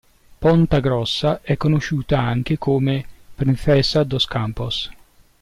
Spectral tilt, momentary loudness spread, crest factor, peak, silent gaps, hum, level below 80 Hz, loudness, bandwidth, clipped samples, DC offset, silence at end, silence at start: -6.5 dB/octave; 8 LU; 14 dB; -6 dBFS; none; none; -38 dBFS; -19 LUFS; 12 kHz; under 0.1%; under 0.1%; 0.5 s; 0.4 s